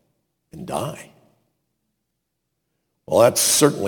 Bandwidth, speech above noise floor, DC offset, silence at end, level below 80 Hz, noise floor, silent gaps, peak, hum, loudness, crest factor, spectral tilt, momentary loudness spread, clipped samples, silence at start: 19 kHz; 59 dB; under 0.1%; 0 s; -60 dBFS; -77 dBFS; none; -2 dBFS; none; -18 LUFS; 22 dB; -3 dB/octave; 22 LU; under 0.1%; 0.55 s